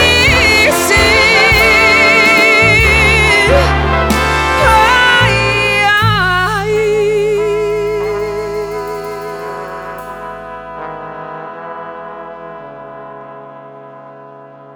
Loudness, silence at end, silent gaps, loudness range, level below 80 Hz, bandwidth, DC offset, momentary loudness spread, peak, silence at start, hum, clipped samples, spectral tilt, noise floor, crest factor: -9 LUFS; 0 s; none; 21 LU; -26 dBFS; over 20 kHz; under 0.1%; 21 LU; 0 dBFS; 0 s; none; under 0.1%; -3.5 dB/octave; -35 dBFS; 12 dB